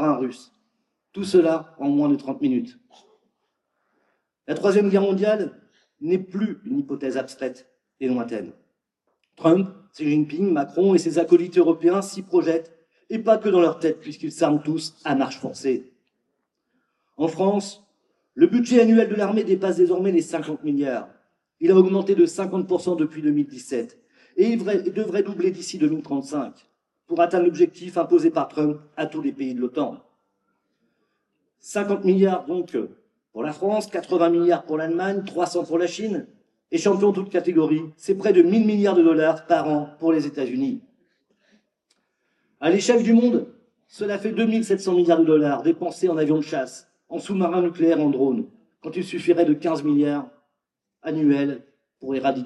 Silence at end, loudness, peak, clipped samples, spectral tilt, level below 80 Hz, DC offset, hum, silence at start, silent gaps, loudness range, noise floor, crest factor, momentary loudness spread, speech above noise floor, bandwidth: 0 s; -22 LUFS; -2 dBFS; under 0.1%; -6.5 dB/octave; -78 dBFS; under 0.1%; none; 0 s; none; 6 LU; -82 dBFS; 20 dB; 13 LU; 61 dB; 11.5 kHz